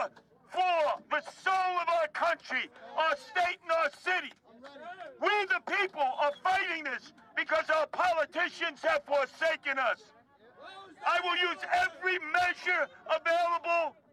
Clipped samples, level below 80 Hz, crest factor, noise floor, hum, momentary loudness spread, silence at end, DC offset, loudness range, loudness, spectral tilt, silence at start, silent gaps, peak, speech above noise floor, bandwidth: under 0.1%; -74 dBFS; 18 dB; -57 dBFS; none; 9 LU; 0.2 s; under 0.1%; 2 LU; -30 LUFS; -2 dB/octave; 0 s; none; -14 dBFS; 26 dB; 13 kHz